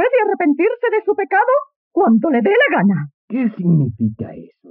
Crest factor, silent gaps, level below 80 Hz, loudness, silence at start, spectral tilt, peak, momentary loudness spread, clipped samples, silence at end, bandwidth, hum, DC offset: 12 dB; 1.76-1.91 s, 3.14-3.28 s; -60 dBFS; -16 LUFS; 0 s; -6 dB/octave; -4 dBFS; 10 LU; under 0.1%; 0.25 s; 3.5 kHz; none; under 0.1%